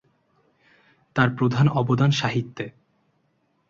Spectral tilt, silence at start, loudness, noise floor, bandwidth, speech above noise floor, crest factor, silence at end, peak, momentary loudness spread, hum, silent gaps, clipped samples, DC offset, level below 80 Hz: -6.5 dB/octave; 1.15 s; -22 LUFS; -68 dBFS; 7.4 kHz; 47 dB; 20 dB; 1 s; -6 dBFS; 14 LU; none; none; under 0.1%; under 0.1%; -56 dBFS